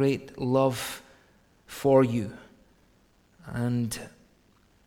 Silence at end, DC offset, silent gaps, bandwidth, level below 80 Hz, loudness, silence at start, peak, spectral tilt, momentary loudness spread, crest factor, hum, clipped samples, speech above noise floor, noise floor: 0.8 s; under 0.1%; none; 18 kHz; -60 dBFS; -27 LUFS; 0 s; -8 dBFS; -6.5 dB/octave; 21 LU; 20 dB; none; under 0.1%; 37 dB; -63 dBFS